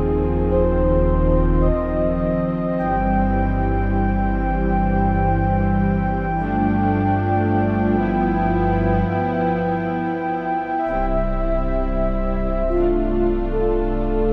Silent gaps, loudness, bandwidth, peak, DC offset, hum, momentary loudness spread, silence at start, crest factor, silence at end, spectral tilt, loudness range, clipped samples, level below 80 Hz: none; -20 LUFS; 4.9 kHz; -4 dBFS; under 0.1%; none; 4 LU; 0 s; 14 dB; 0 s; -11 dB/octave; 3 LU; under 0.1%; -24 dBFS